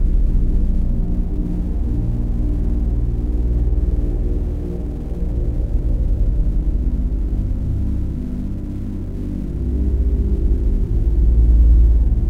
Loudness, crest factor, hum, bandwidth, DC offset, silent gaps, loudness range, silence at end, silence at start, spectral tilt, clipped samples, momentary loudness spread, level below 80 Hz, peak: -21 LUFS; 12 dB; none; 2 kHz; 1%; none; 4 LU; 0 s; 0 s; -10.5 dB/octave; under 0.1%; 10 LU; -18 dBFS; -4 dBFS